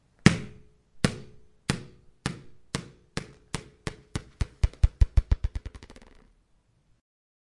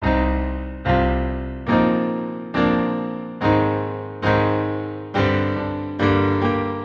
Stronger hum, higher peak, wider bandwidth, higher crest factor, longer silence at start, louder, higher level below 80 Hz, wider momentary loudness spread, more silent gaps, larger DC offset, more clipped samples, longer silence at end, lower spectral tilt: neither; first, 0 dBFS vs -4 dBFS; first, 11.5 kHz vs 7 kHz; first, 30 dB vs 16 dB; first, 0.25 s vs 0 s; second, -31 LUFS vs -21 LUFS; about the same, -34 dBFS vs -32 dBFS; first, 21 LU vs 8 LU; neither; neither; neither; first, 1.6 s vs 0 s; second, -5.5 dB/octave vs -8.5 dB/octave